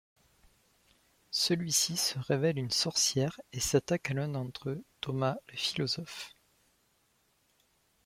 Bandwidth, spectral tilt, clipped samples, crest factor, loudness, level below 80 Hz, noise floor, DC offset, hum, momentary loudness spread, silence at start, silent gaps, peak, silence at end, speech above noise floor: 16.5 kHz; -3.5 dB/octave; under 0.1%; 22 dB; -31 LUFS; -64 dBFS; -72 dBFS; under 0.1%; none; 12 LU; 1.3 s; none; -12 dBFS; 1.75 s; 40 dB